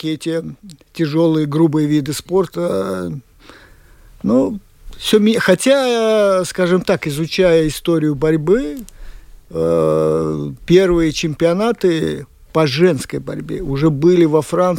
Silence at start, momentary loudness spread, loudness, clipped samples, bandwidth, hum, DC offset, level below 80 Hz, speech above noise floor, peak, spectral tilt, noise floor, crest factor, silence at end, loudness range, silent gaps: 0 s; 12 LU; -16 LUFS; under 0.1%; 17 kHz; none; under 0.1%; -40 dBFS; 29 dB; 0 dBFS; -6 dB/octave; -44 dBFS; 16 dB; 0 s; 4 LU; none